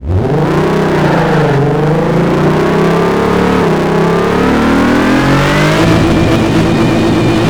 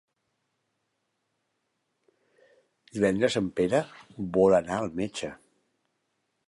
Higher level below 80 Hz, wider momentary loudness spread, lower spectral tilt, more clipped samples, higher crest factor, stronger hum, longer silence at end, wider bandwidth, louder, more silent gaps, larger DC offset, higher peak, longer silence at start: first, -26 dBFS vs -60 dBFS; second, 2 LU vs 17 LU; about the same, -6.5 dB/octave vs -5.5 dB/octave; neither; second, 8 dB vs 22 dB; neither; second, 0 s vs 1.15 s; first, 19 kHz vs 11.5 kHz; first, -10 LUFS vs -26 LUFS; neither; neither; first, 0 dBFS vs -8 dBFS; second, 0 s vs 2.95 s